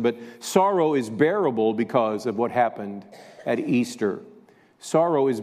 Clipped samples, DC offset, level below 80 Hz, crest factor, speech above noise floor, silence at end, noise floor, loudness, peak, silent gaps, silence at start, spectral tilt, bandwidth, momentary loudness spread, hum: under 0.1%; under 0.1%; -74 dBFS; 18 dB; 30 dB; 0 s; -53 dBFS; -23 LUFS; -6 dBFS; none; 0 s; -5.5 dB/octave; 15 kHz; 14 LU; none